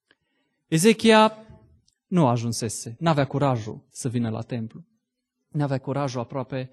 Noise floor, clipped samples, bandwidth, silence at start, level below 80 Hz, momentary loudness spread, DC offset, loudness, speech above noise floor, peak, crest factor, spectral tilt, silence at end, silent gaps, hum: -80 dBFS; under 0.1%; 12.5 kHz; 0.7 s; -62 dBFS; 15 LU; under 0.1%; -23 LUFS; 57 dB; -6 dBFS; 20 dB; -5.5 dB/octave; 0.05 s; none; none